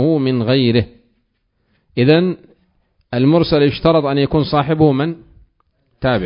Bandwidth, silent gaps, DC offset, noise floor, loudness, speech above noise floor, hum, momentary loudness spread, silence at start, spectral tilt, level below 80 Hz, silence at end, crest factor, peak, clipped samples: 5.4 kHz; none; under 0.1%; -66 dBFS; -15 LUFS; 52 dB; none; 11 LU; 0 s; -10.5 dB/octave; -42 dBFS; 0 s; 16 dB; 0 dBFS; under 0.1%